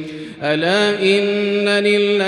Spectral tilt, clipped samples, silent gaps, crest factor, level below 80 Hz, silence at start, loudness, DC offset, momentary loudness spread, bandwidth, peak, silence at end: -4.5 dB/octave; under 0.1%; none; 14 dB; -62 dBFS; 0 s; -16 LUFS; under 0.1%; 7 LU; 11 kHz; -2 dBFS; 0 s